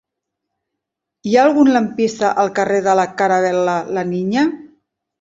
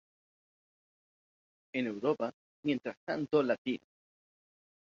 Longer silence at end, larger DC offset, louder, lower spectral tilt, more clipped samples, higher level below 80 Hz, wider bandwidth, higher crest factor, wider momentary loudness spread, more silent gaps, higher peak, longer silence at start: second, 0.55 s vs 1.1 s; neither; first, -16 LUFS vs -35 LUFS; about the same, -5.5 dB/octave vs -4.5 dB/octave; neither; first, -60 dBFS vs -80 dBFS; about the same, 7.8 kHz vs 7.2 kHz; about the same, 16 dB vs 20 dB; about the same, 7 LU vs 9 LU; second, none vs 2.34-2.63 s, 2.97-3.07 s, 3.58-3.65 s; first, -2 dBFS vs -16 dBFS; second, 1.25 s vs 1.75 s